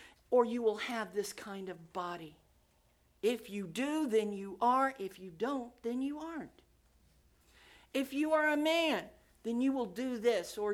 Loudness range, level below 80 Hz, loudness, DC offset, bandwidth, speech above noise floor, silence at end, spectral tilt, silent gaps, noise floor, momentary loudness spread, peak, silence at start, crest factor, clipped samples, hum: 6 LU; -72 dBFS; -35 LUFS; under 0.1%; 17 kHz; 36 dB; 0 s; -4 dB/octave; none; -70 dBFS; 14 LU; -16 dBFS; 0 s; 20 dB; under 0.1%; none